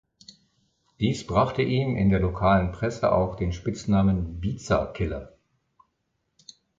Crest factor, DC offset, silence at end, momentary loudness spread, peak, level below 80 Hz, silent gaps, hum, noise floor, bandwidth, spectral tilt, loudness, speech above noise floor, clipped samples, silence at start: 18 dB; under 0.1%; 1.5 s; 9 LU; -8 dBFS; -40 dBFS; none; none; -76 dBFS; 7.8 kHz; -7 dB/octave; -25 LUFS; 52 dB; under 0.1%; 1 s